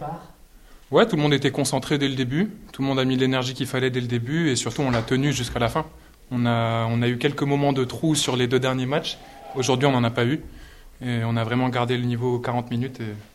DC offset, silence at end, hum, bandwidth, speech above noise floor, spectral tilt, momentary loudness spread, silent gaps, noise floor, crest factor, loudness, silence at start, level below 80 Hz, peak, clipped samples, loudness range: under 0.1%; 0.1 s; none; 14.5 kHz; 25 dB; -5.5 dB/octave; 8 LU; none; -48 dBFS; 20 dB; -23 LUFS; 0 s; -48 dBFS; -4 dBFS; under 0.1%; 2 LU